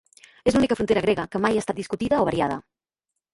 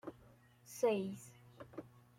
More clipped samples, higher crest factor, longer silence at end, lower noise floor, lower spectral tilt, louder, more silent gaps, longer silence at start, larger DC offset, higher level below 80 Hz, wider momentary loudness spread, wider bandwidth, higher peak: neither; about the same, 18 dB vs 20 dB; first, 0.75 s vs 0.3 s; first, -84 dBFS vs -65 dBFS; about the same, -5.5 dB/octave vs -5.5 dB/octave; first, -23 LUFS vs -38 LUFS; neither; first, 0.45 s vs 0.05 s; neither; first, -50 dBFS vs -78 dBFS; second, 7 LU vs 21 LU; second, 11.5 kHz vs 16.5 kHz; first, -6 dBFS vs -22 dBFS